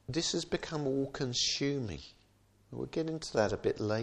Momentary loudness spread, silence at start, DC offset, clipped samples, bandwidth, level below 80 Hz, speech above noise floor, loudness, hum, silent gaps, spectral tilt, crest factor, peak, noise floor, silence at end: 13 LU; 0.1 s; under 0.1%; under 0.1%; 11 kHz; -58 dBFS; 33 dB; -34 LUFS; none; none; -4 dB/octave; 20 dB; -16 dBFS; -66 dBFS; 0 s